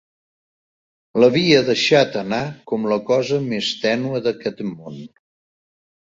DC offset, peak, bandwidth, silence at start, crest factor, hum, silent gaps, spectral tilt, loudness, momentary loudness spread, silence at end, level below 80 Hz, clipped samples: under 0.1%; -2 dBFS; 7.8 kHz; 1.15 s; 18 dB; none; none; -5 dB/octave; -18 LUFS; 14 LU; 1.05 s; -60 dBFS; under 0.1%